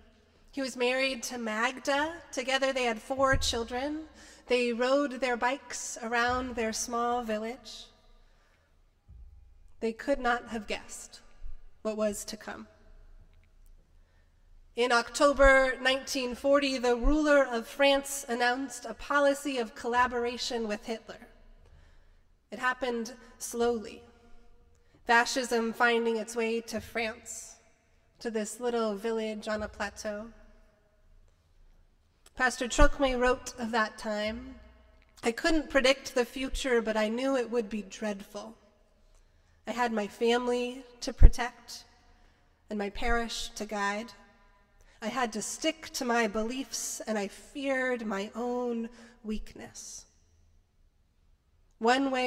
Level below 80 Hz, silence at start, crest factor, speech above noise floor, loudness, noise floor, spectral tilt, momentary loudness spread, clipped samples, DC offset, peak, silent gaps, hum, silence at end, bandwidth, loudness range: -38 dBFS; 0.55 s; 26 dB; 37 dB; -30 LUFS; -66 dBFS; -3.5 dB/octave; 16 LU; under 0.1%; under 0.1%; -4 dBFS; none; none; 0 s; 16 kHz; 9 LU